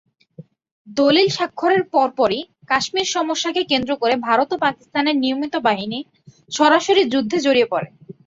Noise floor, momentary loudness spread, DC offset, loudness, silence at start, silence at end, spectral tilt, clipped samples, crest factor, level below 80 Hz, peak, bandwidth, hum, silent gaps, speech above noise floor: -44 dBFS; 9 LU; under 0.1%; -18 LUFS; 0.4 s; 0.15 s; -3.5 dB/octave; under 0.1%; 16 dB; -60 dBFS; -2 dBFS; 7.8 kHz; none; 0.71-0.85 s; 26 dB